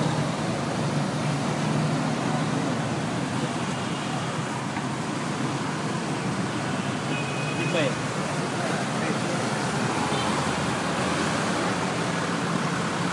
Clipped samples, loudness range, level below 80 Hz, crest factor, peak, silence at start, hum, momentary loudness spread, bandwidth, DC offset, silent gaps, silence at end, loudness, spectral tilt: under 0.1%; 3 LU; -60 dBFS; 16 dB; -10 dBFS; 0 s; none; 3 LU; 11.5 kHz; under 0.1%; none; 0 s; -26 LUFS; -5 dB/octave